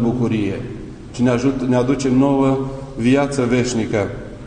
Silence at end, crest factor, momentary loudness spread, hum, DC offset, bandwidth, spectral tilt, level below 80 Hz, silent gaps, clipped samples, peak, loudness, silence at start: 0 s; 14 dB; 12 LU; none; under 0.1%; 9.8 kHz; -6.5 dB/octave; -40 dBFS; none; under 0.1%; -4 dBFS; -18 LUFS; 0 s